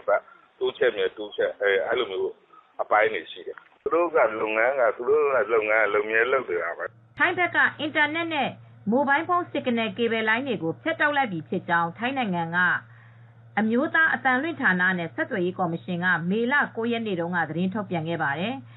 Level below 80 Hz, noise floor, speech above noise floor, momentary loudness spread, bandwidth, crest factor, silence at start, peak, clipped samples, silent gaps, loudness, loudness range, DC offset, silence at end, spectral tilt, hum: -70 dBFS; -50 dBFS; 25 dB; 8 LU; 4.1 kHz; 18 dB; 0.05 s; -6 dBFS; under 0.1%; none; -24 LUFS; 3 LU; under 0.1%; 0 s; -3 dB/octave; none